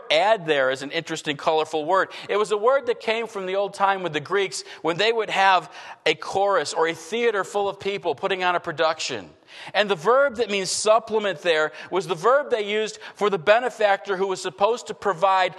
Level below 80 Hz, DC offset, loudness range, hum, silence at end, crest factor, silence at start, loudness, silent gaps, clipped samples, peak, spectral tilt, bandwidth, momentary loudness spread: -70 dBFS; under 0.1%; 2 LU; none; 0 s; 20 dB; 0.05 s; -23 LUFS; none; under 0.1%; -2 dBFS; -3 dB/octave; 12.5 kHz; 8 LU